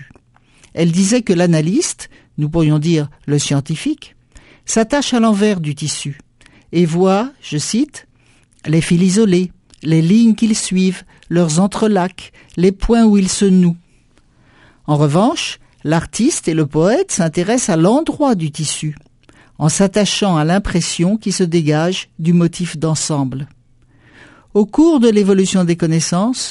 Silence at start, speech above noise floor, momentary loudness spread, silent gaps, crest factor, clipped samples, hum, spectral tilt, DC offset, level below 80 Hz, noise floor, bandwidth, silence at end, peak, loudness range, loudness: 0 s; 38 dB; 11 LU; none; 16 dB; under 0.1%; none; -5.5 dB/octave; under 0.1%; -40 dBFS; -52 dBFS; 11.5 kHz; 0 s; 0 dBFS; 3 LU; -15 LUFS